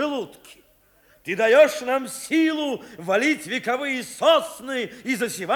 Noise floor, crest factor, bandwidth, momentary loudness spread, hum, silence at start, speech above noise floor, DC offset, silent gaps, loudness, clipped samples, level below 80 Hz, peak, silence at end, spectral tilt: -58 dBFS; 18 dB; over 20 kHz; 13 LU; none; 0 s; 36 dB; under 0.1%; none; -22 LUFS; under 0.1%; -68 dBFS; -6 dBFS; 0 s; -3 dB/octave